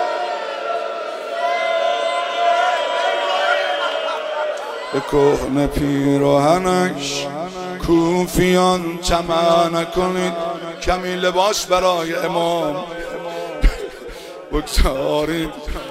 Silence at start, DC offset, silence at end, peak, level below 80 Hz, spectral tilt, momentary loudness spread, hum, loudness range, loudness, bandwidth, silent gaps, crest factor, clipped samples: 0 s; under 0.1%; 0 s; -2 dBFS; -30 dBFS; -4.5 dB/octave; 11 LU; none; 4 LU; -19 LUFS; 16 kHz; none; 16 dB; under 0.1%